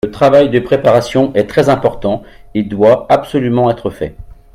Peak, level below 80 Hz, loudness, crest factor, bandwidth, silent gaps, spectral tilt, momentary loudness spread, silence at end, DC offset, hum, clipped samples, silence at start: 0 dBFS; -40 dBFS; -12 LUFS; 12 dB; 14 kHz; none; -7 dB/octave; 12 LU; 0.3 s; under 0.1%; none; under 0.1%; 0.05 s